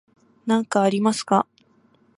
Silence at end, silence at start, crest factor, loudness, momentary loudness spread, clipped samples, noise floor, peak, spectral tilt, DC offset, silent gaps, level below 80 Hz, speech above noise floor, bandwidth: 0.75 s; 0.45 s; 20 dB; -22 LUFS; 10 LU; under 0.1%; -59 dBFS; -4 dBFS; -5 dB/octave; under 0.1%; none; -70 dBFS; 39 dB; 11.5 kHz